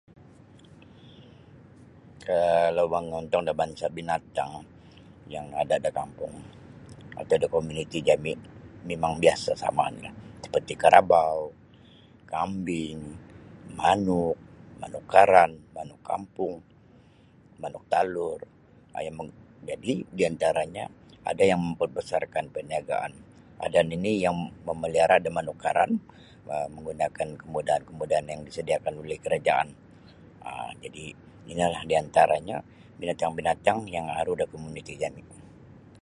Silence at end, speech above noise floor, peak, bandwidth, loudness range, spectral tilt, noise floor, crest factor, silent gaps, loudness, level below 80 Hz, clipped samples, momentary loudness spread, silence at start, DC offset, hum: 0.55 s; 30 dB; 0 dBFS; 11.5 kHz; 7 LU; -5 dB/octave; -56 dBFS; 26 dB; none; -26 LUFS; -56 dBFS; under 0.1%; 18 LU; 1.05 s; under 0.1%; none